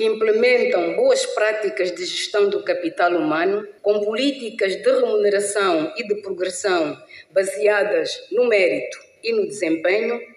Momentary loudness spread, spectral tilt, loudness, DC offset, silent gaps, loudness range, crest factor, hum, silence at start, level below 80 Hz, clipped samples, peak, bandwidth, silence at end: 7 LU; -3 dB/octave; -20 LUFS; under 0.1%; none; 2 LU; 14 dB; none; 0 s; -74 dBFS; under 0.1%; -6 dBFS; 12 kHz; 0.1 s